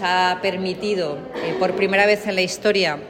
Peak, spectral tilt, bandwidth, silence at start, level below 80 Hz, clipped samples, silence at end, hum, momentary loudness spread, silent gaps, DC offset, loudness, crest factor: -4 dBFS; -4 dB/octave; 16.5 kHz; 0 s; -56 dBFS; under 0.1%; 0 s; none; 9 LU; none; under 0.1%; -20 LUFS; 16 dB